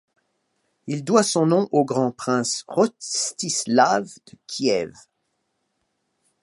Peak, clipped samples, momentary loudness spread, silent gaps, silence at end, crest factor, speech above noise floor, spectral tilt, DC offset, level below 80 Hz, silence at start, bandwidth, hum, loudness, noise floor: -2 dBFS; under 0.1%; 13 LU; none; 1.55 s; 22 dB; 52 dB; -4 dB/octave; under 0.1%; -70 dBFS; 0.85 s; 11.5 kHz; none; -21 LUFS; -74 dBFS